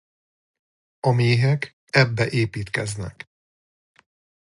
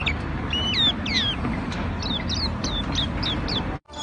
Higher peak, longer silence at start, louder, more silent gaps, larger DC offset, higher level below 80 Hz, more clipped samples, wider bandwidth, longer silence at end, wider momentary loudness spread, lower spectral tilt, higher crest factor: first, -2 dBFS vs -10 dBFS; first, 1.05 s vs 0 s; about the same, -22 LUFS vs -24 LUFS; first, 1.73-1.87 s vs none; neither; second, -52 dBFS vs -34 dBFS; neither; first, 11.5 kHz vs 10 kHz; first, 1.45 s vs 0 s; first, 16 LU vs 8 LU; first, -6 dB/octave vs -4 dB/octave; first, 22 dB vs 16 dB